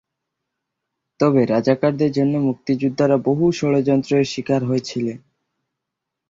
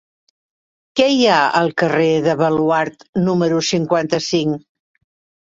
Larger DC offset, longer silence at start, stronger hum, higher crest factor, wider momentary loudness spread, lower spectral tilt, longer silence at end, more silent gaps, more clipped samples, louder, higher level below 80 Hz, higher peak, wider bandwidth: neither; first, 1.2 s vs 0.95 s; neither; about the same, 16 dB vs 16 dB; second, 5 LU vs 8 LU; first, -7 dB/octave vs -5 dB/octave; first, 1.15 s vs 0.9 s; second, none vs 3.09-3.13 s; neither; second, -19 LUFS vs -16 LUFS; about the same, -58 dBFS vs -58 dBFS; about the same, -4 dBFS vs -2 dBFS; about the same, 7.6 kHz vs 7.8 kHz